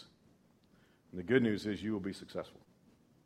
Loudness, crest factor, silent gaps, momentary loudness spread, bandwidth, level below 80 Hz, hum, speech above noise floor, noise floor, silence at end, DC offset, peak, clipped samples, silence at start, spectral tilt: -36 LUFS; 24 dB; none; 17 LU; 13 kHz; -70 dBFS; none; 32 dB; -67 dBFS; 0.75 s; under 0.1%; -14 dBFS; under 0.1%; 0 s; -6.5 dB/octave